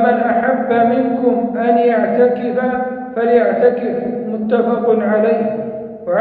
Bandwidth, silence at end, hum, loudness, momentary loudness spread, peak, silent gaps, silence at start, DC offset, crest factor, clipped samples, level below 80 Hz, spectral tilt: 4.6 kHz; 0 s; none; -15 LUFS; 8 LU; -2 dBFS; none; 0 s; under 0.1%; 14 dB; under 0.1%; -58 dBFS; -10.5 dB/octave